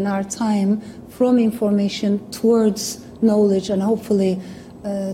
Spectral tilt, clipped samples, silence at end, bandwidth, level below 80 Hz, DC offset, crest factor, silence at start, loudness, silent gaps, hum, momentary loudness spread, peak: -6 dB/octave; under 0.1%; 0 s; 16 kHz; -54 dBFS; under 0.1%; 12 dB; 0 s; -19 LUFS; none; none; 11 LU; -6 dBFS